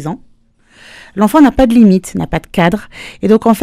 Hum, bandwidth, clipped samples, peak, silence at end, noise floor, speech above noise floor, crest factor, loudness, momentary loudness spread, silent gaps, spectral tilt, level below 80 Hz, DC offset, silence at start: none; 15.5 kHz; 0.2%; 0 dBFS; 0 s; -48 dBFS; 38 dB; 12 dB; -11 LUFS; 18 LU; none; -7 dB/octave; -34 dBFS; under 0.1%; 0 s